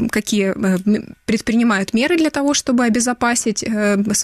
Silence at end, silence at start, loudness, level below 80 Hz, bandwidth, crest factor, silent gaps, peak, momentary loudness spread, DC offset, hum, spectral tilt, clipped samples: 0 s; 0 s; -17 LUFS; -48 dBFS; 15 kHz; 12 dB; none; -6 dBFS; 4 LU; under 0.1%; none; -4 dB/octave; under 0.1%